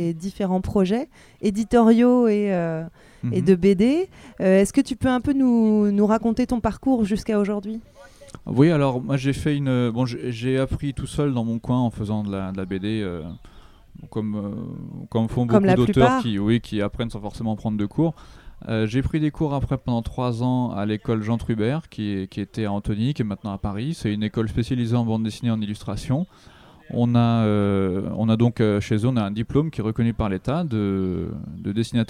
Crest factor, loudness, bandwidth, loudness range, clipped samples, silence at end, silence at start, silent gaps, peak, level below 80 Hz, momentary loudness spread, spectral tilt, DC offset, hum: 20 dB; -22 LUFS; 12.5 kHz; 6 LU; under 0.1%; 0.05 s; 0 s; none; -2 dBFS; -42 dBFS; 11 LU; -7.5 dB/octave; under 0.1%; none